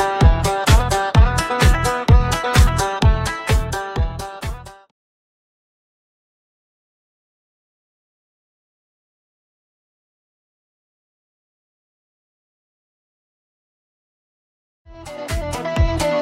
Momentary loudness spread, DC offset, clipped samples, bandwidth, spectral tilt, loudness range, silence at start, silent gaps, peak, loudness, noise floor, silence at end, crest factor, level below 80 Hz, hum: 13 LU; under 0.1%; under 0.1%; 16 kHz; -5 dB/octave; 19 LU; 0 s; 4.91-14.85 s; 0 dBFS; -18 LUFS; under -90 dBFS; 0 s; 20 dB; -24 dBFS; none